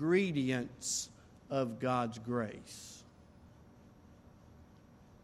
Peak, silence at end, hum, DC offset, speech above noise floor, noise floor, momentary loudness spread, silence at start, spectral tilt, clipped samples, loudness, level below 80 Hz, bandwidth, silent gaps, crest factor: -18 dBFS; 0.6 s; none; under 0.1%; 25 dB; -60 dBFS; 17 LU; 0 s; -4.5 dB/octave; under 0.1%; -36 LUFS; -68 dBFS; 15 kHz; none; 20 dB